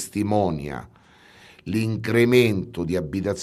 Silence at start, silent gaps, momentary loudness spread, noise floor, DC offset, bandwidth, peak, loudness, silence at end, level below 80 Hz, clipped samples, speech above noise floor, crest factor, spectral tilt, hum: 0 s; none; 15 LU; -51 dBFS; under 0.1%; 14.5 kHz; -4 dBFS; -22 LUFS; 0 s; -50 dBFS; under 0.1%; 29 dB; 20 dB; -6 dB/octave; none